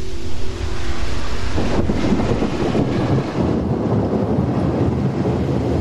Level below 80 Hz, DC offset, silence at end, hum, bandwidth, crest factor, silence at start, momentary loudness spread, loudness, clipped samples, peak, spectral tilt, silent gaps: -30 dBFS; under 0.1%; 0 s; none; 11.5 kHz; 12 dB; 0 s; 7 LU; -20 LUFS; under 0.1%; -4 dBFS; -7.5 dB/octave; none